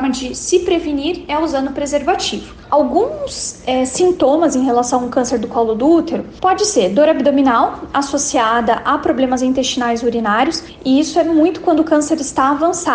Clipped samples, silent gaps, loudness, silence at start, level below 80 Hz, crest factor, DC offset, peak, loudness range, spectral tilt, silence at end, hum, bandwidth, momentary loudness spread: under 0.1%; none; -15 LUFS; 0 s; -42 dBFS; 12 dB; under 0.1%; -2 dBFS; 3 LU; -3.5 dB/octave; 0 s; none; 10 kHz; 7 LU